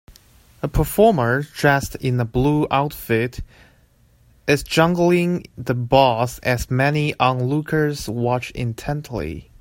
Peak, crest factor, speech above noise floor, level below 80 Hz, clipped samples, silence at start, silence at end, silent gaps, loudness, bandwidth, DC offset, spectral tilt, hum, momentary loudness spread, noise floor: 0 dBFS; 20 dB; 36 dB; -38 dBFS; under 0.1%; 0.1 s; 0.15 s; none; -20 LUFS; 16.5 kHz; under 0.1%; -6 dB/octave; none; 11 LU; -55 dBFS